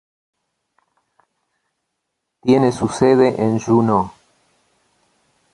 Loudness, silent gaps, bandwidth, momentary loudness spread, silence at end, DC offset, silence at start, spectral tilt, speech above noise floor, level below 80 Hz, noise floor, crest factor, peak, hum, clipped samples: -16 LUFS; none; 11.5 kHz; 7 LU; 1.45 s; under 0.1%; 2.45 s; -7 dB/octave; 61 dB; -52 dBFS; -76 dBFS; 18 dB; -2 dBFS; none; under 0.1%